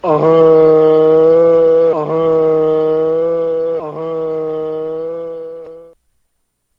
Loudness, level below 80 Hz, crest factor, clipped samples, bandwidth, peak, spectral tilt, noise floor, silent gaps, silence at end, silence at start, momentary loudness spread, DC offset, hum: -12 LUFS; -54 dBFS; 12 dB; under 0.1%; 5 kHz; 0 dBFS; -9 dB/octave; -66 dBFS; none; 0.95 s; 0.05 s; 14 LU; under 0.1%; none